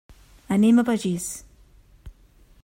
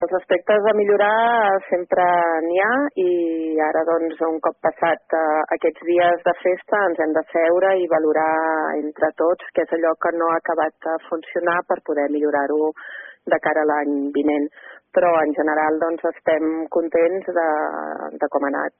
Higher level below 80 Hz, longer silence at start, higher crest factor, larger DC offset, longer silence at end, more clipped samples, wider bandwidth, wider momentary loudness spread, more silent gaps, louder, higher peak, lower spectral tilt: first, -52 dBFS vs -68 dBFS; first, 0.5 s vs 0 s; about the same, 16 dB vs 14 dB; neither; first, 0.55 s vs 0.1 s; neither; first, 16 kHz vs 3.7 kHz; first, 14 LU vs 6 LU; neither; about the same, -22 LUFS vs -20 LUFS; about the same, -8 dBFS vs -6 dBFS; first, -5.5 dB/octave vs -3 dB/octave